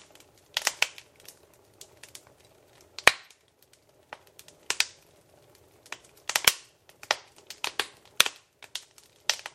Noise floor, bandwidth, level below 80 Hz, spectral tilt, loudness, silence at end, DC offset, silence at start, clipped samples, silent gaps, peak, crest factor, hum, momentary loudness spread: -63 dBFS; 16 kHz; -64 dBFS; 1 dB/octave; -27 LUFS; 0.05 s; under 0.1%; 0.55 s; under 0.1%; none; 0 dBFS; 34 dB; none; 26 LU